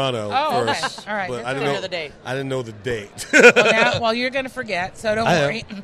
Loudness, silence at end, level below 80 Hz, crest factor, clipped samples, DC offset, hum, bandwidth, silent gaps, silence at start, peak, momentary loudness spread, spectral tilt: -19 LUFS; 0 s; -52 dBFS; 20 dB; under 0.1%; under 0.1%; none; 14.5 kHz; none; 0 s; 0 dBFS; 16 LU; -4 dB/octave